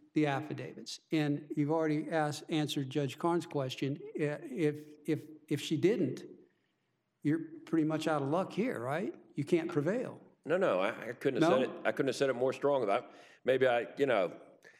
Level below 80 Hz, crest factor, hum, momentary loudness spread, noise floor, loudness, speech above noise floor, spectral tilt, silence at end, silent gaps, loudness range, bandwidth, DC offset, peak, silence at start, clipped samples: under -90 dBFS; 18 dB; none; 8 LU; -80 dBFS; -33 LUFS; 47 dB; -6 dB/octave; 0.1 s; none; 4 LU; 14.5 kHz; under 0.1%; -14 dBFS; 0.15 s; under 0.1%